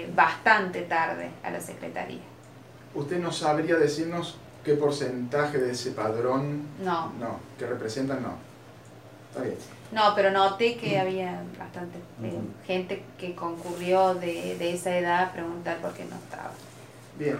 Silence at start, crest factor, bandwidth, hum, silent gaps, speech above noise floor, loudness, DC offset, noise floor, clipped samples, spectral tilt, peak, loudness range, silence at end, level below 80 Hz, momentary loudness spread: 0 s; 22 dB; 16 kHz; none; none; 21 dB; -28 LUFS; under 0.1%; -48 dBFS; under 0.1%; -5 dB/octave; -6 dBFS; 4 LU; 0 s; -70 dBFS; 16 LU